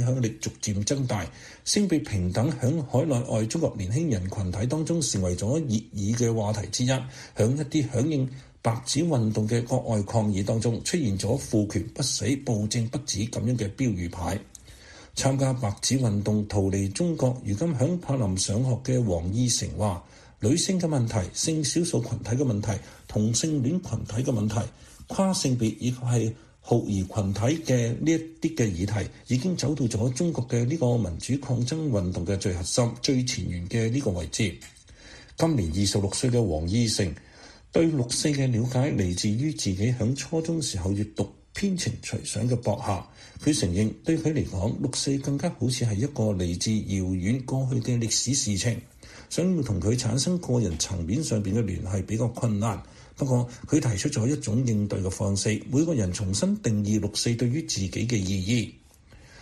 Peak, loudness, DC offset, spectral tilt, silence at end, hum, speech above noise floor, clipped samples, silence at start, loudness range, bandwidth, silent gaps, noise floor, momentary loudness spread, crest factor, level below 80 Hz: -8 dBFS; -26 LUFS; under 0.1%; -5.5 dB/octave; 0 s; none; 26 dB; under 0.1%; 0 s; 2 LU; 13.5 kHz; none; -52 dBFS; 5 LU; 18 dB; -48 dBFS